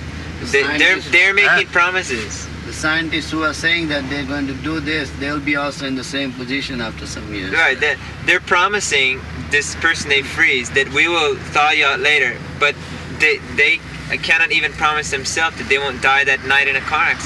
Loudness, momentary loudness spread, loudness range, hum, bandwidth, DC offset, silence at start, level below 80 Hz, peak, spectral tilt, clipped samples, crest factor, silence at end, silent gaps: -16 LUFS; 10 LU; 5 LU; none; 12.5 kHz; under 0.1%; 0 s; -38 dBFS; -2 dBFS; -3 dB/octave; under 0.1%; 16 dB; 0 s; none